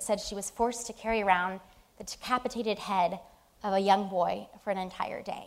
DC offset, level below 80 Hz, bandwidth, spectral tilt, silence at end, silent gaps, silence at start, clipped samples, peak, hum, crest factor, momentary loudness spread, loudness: under 0.1%; -58 dBFS; 16 kHz; -3.5 dB/octave; 0 s; none; 0 s; under 0.1%; -8 dBFS; none; 22 dB; 13 LU; -31 LUFS